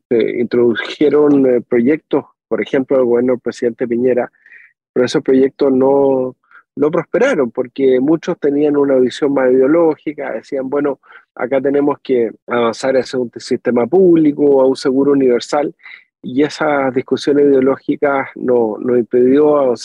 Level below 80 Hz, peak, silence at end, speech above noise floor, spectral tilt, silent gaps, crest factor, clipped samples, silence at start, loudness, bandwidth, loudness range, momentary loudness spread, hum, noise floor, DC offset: -62 dBFS; -4 dBFS; 0 s; 31 dB; -6.5 dB/octave; 4.89-4.94 s, 12.42-12.47 s; 10 dB; under 0.1%; 0.1 s; -14 LUFS; 10.5 kHz; 3 LU; 9 LU; none; -44 dBFS; under 0.1%